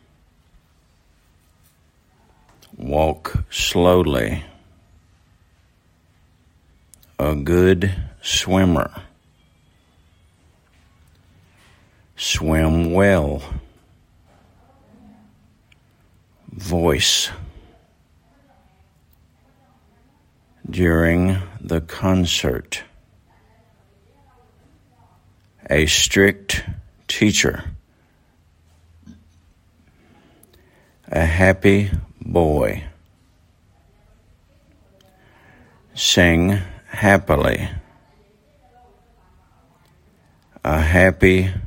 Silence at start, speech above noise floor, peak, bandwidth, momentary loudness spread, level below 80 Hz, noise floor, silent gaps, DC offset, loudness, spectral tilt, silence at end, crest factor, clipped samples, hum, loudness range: 2.8 s; 41 dB; 0 dBFS; 16.5 kHz; 18 LU; -38 dBFS; -58 dBFS; none; under 0.1%; -18 LUFS; -4.5 dB/octave; 0 s; 22 dB; under 0.1%; none; 10 LU